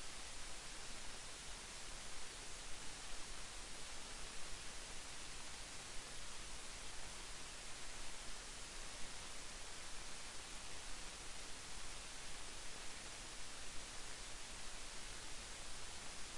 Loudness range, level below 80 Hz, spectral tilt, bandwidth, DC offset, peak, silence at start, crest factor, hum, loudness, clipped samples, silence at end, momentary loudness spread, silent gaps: 0 LU; -58 dBFS; -1 dB/octave; 11.5 kHz; under 0.1%; -34 dBFS; 0 s; 14 dB; none; -50 LUFS; under 0.1%; 0 s; 0 LU; none